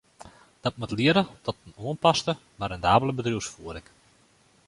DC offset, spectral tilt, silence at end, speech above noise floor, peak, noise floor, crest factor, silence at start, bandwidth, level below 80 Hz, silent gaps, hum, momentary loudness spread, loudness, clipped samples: under 0.1%; -5 dB/octave; 0.9 s; 36 dB; -4 dBFS; -61 dBFS; 22 dB; 0.25 s; 11.5 kHz; -52 dBFS; none; none; 14 LU; -26 LUFS; under 0.1%